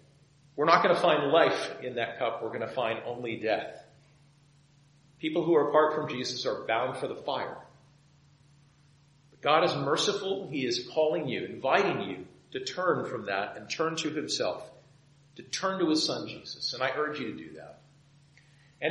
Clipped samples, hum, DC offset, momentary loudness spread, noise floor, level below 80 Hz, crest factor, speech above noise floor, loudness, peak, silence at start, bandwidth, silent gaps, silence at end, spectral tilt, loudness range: under 0.1%; none; under 0.1%; 13 LU; -61 dBFS; -74 dBFS; 24 dB; 32 dB; -29 LUFS; -6 dBFS; 0.55 s; 11 kHz; none; 0 s; -4 dB/octave; 6 LU